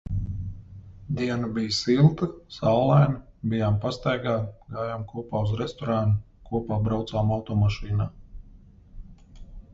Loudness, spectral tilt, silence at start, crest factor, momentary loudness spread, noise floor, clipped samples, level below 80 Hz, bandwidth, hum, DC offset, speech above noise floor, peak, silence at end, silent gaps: -26 LUFS; -7.5 dB/octave; 0.05 s; 18 dB; 14 LU; -50 dBFS; under 0.1%; -42 dBFS; 7.8 kHz; none; under 0.1%; 26 dB; -6 dBFS; 0.15 s; none